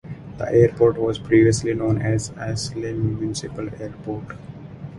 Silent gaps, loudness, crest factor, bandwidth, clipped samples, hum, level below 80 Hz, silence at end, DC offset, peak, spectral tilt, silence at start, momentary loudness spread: none; -21 LUFS; 18 dB; 11.5 kHz; under 0.1%; none; -44 dBFS; 0 s; under 0.1%; -2 dBFS; -6.5 dB/octave; 0.05 s; 18 LU